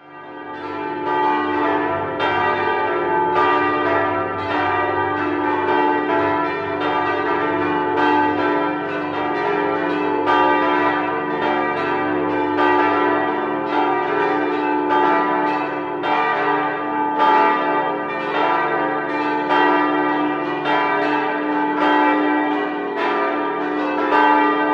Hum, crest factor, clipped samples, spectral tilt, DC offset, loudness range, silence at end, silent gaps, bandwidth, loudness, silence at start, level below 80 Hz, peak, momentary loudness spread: none; 16 dB; under 0.1%; -6.5 dB/octave; under 0.1%; 1 LU; 0 s; none; 7.2 kHz; -19 LUFS; 0.05 s; -56 dBFS; -2 dBFS; 6 LU